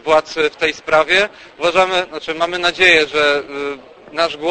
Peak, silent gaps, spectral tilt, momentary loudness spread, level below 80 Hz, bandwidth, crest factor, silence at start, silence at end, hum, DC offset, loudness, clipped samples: 0 dBFS; none; -2.5 dB/octave; 14 LU; -50 dBFS; 9.2 kHz; 16 dB; 0.05 s; 0 s; none; under 0.1%; -15 LUFS; under 0.1%